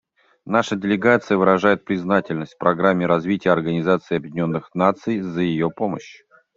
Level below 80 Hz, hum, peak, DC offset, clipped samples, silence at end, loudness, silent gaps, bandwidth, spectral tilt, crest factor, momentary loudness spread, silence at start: -58 dBFS; none; -2 dBFS; under 0.1%; under 0.1%; 0.45 s; -20 LUFS; none; 7.6 kHz; -7 dB/octave; 18 dB; 7 LU; 0.45 s